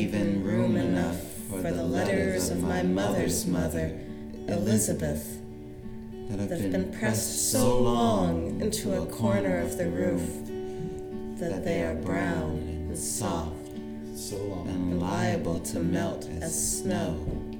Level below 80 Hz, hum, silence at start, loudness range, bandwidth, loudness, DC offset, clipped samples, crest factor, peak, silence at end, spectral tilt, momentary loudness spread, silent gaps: -44 dBFS; none; 0 s; 5 LU; 20 kHz; -29 LUFS; under 0.1%; under 0.1%; 18 dB; -10 dBFS; 0 s; -5 dB/octave; 12 LU; none